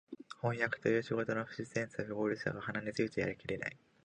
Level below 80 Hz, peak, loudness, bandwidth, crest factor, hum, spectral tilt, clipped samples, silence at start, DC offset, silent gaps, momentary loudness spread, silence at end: -68 dBFS; -18 dBFS; -37 LUFS; 10 kHz; 20 dB; none; -6.5 dB/octave; under 0.1%; 0.1 s; under 0.1%; none; 6 LU; 0.3 s